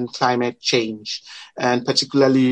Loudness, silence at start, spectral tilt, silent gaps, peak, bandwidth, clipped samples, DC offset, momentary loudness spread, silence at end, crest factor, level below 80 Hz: -19 LUFS; 0 s; -4.5 dB/octave; none; -2 dBFS; 10 kHz; under 0.1%; under 0.1%; 13 LU; 0 s; 18 dB; -68 dBFS